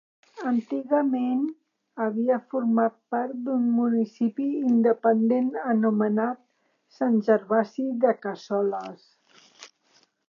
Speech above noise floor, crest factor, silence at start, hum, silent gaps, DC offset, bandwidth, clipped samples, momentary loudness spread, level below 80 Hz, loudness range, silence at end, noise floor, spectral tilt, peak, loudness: 40 dB; 18 dB; 0.35 s; none; none; under 0.1%; 7 kHz; under 0.1%; 9 LU; -84 dBFS; 3 LU; 0.6 s; -64 dBFS; -8 dB/octave; -8 dBFS; -25 LUFS